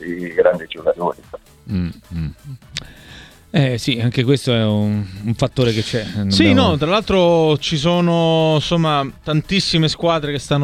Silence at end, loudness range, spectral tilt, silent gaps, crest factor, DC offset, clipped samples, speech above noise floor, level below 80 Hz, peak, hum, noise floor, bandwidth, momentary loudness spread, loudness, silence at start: 0 s; 8 LU; -6 dB/octave; none; 18 dB; under 0.1%; under 0.1%; 24 dB; -40 dBFS; 0 dBFS; none; -41 dBFS; 13.5 kHz; 13 LU; -17 LUFS; 0 s